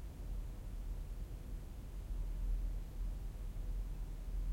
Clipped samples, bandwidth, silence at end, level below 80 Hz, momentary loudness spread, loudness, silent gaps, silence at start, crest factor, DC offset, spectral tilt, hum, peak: under 0.1%; 16 kHz; 0 s; -42 dBFS; 6 LU; -47 LUFS; none; 0 s; 12 dB; under 0.1%; -6.5 dB/octave; none; -30 dBFS